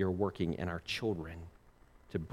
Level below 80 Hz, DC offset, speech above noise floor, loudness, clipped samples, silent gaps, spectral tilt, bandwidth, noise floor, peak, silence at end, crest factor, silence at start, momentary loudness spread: -56 dBFS; under 0.1%; 26 dB; -37 LUFS; under 0.1%; none; -6.5 dB/octave; 16 kHz; -62 dBFS; -18 dBFS; 0 s; 18 dB; 0 s; 14 LU